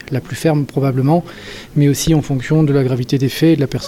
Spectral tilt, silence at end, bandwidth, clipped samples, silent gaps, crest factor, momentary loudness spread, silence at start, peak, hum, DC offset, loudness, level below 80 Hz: -6.5 dB/octave; 0 s; 16 kHz; under 0.1%; none; 14 dB; 7 LU; 0.05 s; -2 dBFS; none; under 0.1%; -15 LUFS; -38 dBFS